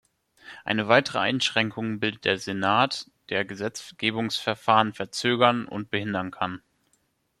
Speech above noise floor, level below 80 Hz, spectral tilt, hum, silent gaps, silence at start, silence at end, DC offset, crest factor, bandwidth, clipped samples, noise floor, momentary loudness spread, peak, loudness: 45 dB; -66 dBFS; -4.5 dB/octave; none; none; 0.45 s; 0.8 s; under 0.1%; 24 dB; 13 kHz; under 0.1%; -70 dBFS; 11 LU; -2 dBFS; -25 LUFS